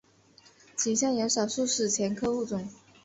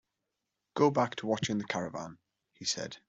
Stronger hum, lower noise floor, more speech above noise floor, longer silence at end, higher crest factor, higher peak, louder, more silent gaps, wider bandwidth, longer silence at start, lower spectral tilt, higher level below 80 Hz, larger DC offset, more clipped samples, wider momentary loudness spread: neither; second, -59 dBFS vs -86 dBFS; second, 31 dB vs 54 dB; first, 0.3 s vs 0.1 s; second, 16 dB vs 22 dB; about the same, -14 dBFS vs -12 dBFS; first, -28 LUFS vs -32 LUFS; neither; about the same, 8.2 kHz vs 8.2 kHz; about the same, 0.75 s vs 0.75 s; second, -3 dB/octave vs -4.5 dB/octave; about the same, -66 dBFS vs -70 dBFS; neither; neither; second, 10 LU vs 15 LU